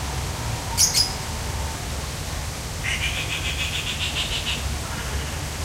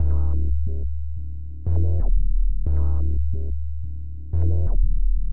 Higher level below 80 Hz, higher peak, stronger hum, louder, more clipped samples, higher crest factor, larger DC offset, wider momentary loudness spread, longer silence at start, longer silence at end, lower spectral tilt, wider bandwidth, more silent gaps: second, -34 dBFS vs -22 dBFS; first, -2 dBFS vs -8 dBFS; neither; about the same, -24 LUFS vs -26 LUFS; neither; first, 22 dB vs 10 dB; second, under 0.1% vs 8%; about the same, 11 LU vs 10 LU; about the same, 0 s vs 0 s; about the same, 0 s vs 0 s; second, -2 dB/octave vs -14.5 dB/octave; first, 16 kHz vs 1.5 kHz; neither